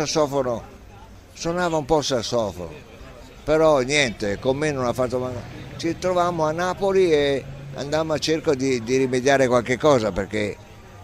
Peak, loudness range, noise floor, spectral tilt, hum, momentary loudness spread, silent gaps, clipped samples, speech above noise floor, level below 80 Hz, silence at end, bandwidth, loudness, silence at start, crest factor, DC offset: -4 dBFS; 3 LU; -44 dBFS; -4.5 dB/octave; none; 14 LU; none; under 0.1%; 22 dB; -46 dBFS; 0 s; 15 kHz; -22 LUFS; 0 s; 18 dB; under 0.1%